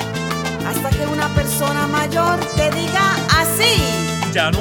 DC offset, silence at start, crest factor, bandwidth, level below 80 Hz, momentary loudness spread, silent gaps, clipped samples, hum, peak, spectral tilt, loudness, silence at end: under 0.1%; 0 s; 18 dB; 19.5 kHz; -32 dBFS; 7 LU; none; under 0.1%; none; 0 dBFS; -4 dB/octave; -17 LUFS; 0 s